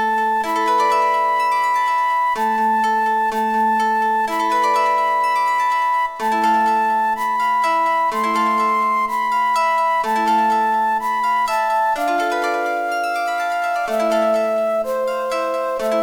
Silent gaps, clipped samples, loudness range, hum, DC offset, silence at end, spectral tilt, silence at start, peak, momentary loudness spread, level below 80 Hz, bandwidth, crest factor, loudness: none; under 0.1%; 2 LU; none; under 0.1%; 0 s; -3 dB/octave; 0 s; -8 dBFS; 4 LU; -60 dBFS; 18 kHz; 10 dB; -18 LUFS